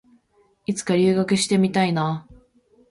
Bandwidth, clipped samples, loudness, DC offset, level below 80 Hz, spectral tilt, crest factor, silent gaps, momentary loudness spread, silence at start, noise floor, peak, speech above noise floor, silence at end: 11.5 kHz; under 0.1%; -21 LUFS; under 0.1%; -58 dBFS; -5.5 dB/octave; 16 dB; none; 11 LU; 0.7 s; -62 dBFS; -8 dBFS; 42 dB; 0.55 s